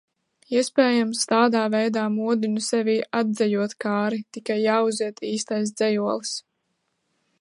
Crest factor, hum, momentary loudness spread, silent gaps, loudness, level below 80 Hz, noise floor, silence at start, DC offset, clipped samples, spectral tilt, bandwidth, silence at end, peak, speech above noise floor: 18 dB; none; 8 LU; none; -23 LUFS; -76 dBFS; -74 dBFS; 0.5 s; under 0.1%; under 0.1%; -4 dB/octave; 11.5 kHz; 1 s; -6 dBFS; 52 dB